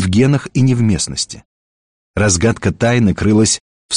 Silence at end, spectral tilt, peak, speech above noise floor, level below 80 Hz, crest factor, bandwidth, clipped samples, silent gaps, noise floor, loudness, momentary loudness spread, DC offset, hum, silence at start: 0 s; -5 dB/octave; -2 dBFS; over 77 dB; -38 dBFS; 12 dB; 10 kHz; under 0.1%; 1.45-2.14 s, 3.60-3.89 s; under -90 dBFS; -14 LUFS; 9 LU; under 0.1%; none; 0 s